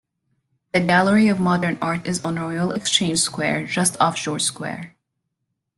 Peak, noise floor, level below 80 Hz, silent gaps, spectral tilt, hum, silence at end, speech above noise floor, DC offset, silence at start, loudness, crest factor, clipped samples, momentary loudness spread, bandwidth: -2 dBFS; -77 dBFS; -58 dBFS; none; -4 dB/octave; none; 0.9 s; 57 dB; under 0.1%; 0.75 s; -20 LUFS; 18 dB; under 0.1%; 8 LU; 12.5 kHz